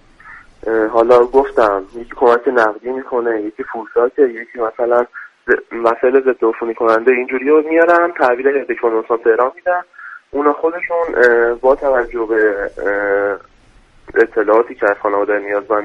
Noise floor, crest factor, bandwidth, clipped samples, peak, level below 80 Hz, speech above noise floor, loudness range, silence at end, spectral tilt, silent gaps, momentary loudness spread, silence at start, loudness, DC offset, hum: -47 dBFS; 14 dB; 7.4 kHz; under 0.1%; 0 dBFS; -46 dBFS; 33 dB; 3 LU; 0 s; -6 dB/octave; none; 10 LU; 0.25 s; -15 LUFS; under 0.1%; none